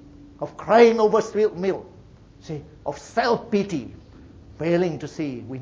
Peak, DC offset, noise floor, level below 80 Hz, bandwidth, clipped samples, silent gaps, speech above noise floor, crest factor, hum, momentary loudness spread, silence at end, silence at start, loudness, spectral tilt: -2 dBFS; under 0.1%; -48 dBFS; -54 dBFS; 7.8 kHz; under 0.1%; none; 26 dB; 22 dB; none; 20 LU; 0 s; 0.2 s; -22 LUFS; -6 dB/octave